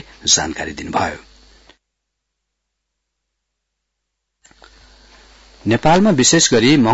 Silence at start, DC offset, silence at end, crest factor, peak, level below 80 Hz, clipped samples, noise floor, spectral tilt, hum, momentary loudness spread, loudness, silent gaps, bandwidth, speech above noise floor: 0.25 s; under 0.1%; 0 s; 18 dB; -2 dBFS; -46 dBFS; under 0.1%; -76 dBFS; -3.5 dB/octave; none; 14 LU; -14 LUFS; none; 8 kHz; 62 dB